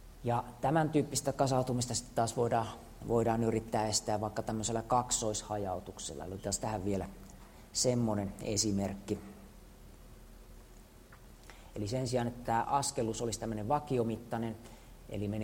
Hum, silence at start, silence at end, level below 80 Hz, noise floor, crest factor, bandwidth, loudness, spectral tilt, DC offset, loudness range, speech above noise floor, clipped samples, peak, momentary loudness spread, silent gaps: none; 0 s; 0 s; -54 dBFS; -55 dBFS; 20 dB; 16 kHz; -34 LUFS; -4.5 dB/octave; under 0.1%; 7 LU; 22 dB; under 0.1%; -16 dBFS; 14 LU; none